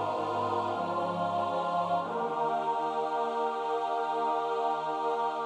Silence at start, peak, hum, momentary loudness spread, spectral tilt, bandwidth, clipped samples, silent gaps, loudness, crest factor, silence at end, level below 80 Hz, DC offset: 0 s; -18 dBFS; none; 1 LU; -6 dB/octave; 11 kHz; under 0.1%; none; -31 LUFS; 12 dB; 0 s; -80 dBFS; under 0.1%